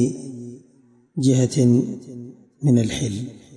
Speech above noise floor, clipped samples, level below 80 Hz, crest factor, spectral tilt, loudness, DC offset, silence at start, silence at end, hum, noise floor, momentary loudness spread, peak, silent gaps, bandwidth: 36 dB; under 0.1%; -54 dBFS; 16 dB; -6.5 dB/octave; -20 LUFS; under 0.1%; 0 s; 0 s; none; -55 dBFS; 21 LU; -6 dBFS; none; 11.5 kHz